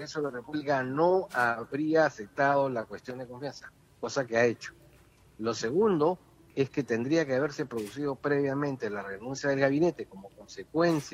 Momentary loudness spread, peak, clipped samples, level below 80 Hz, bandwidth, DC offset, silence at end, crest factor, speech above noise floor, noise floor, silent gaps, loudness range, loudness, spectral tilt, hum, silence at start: 15 LU; -10 dBFS; under 0.1%; -66 dBFS; 15.5 kHz; under 0.1%; 0 s; 18 dB; 30 dB; -59 dBFS; none; 3 LU; -29 LUFS; -6 dB/octave; none; 0 s